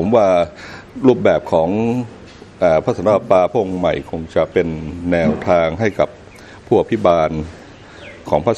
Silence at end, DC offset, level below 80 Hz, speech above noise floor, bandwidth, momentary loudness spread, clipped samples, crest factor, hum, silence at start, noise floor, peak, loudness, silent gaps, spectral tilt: 0 s; under 0.1%; -42 dBFS; 23 dB; 8.8 kHz; 12 LU; under 0.1%; 16 dB; none; 0 s; -39 dBFS; 0 dBFS; -16 LUFS; none; -7.5 dB/octave